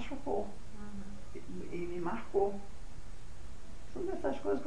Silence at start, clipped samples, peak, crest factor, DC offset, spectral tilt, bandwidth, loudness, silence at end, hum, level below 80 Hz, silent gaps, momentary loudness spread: 0 s; under 0.1%; -18 dBFS; 18 dB; 2%; -6.5 dB/octave; 10.5 kHz; -39 LUFS; 0 s; none; -50 dBFS; none; 19 LU